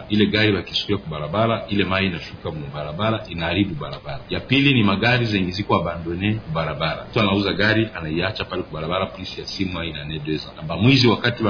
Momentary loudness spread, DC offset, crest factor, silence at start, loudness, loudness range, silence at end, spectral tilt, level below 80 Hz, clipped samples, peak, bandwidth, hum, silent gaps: 12 LU; under 0.1%; 18 dB; 0 s; -21 LUFS; 3 LU; 0 s; -6.5 dB/octave; -44 dBFS; under 0.1%; -4 dBFS; 5.4 kHz; none; none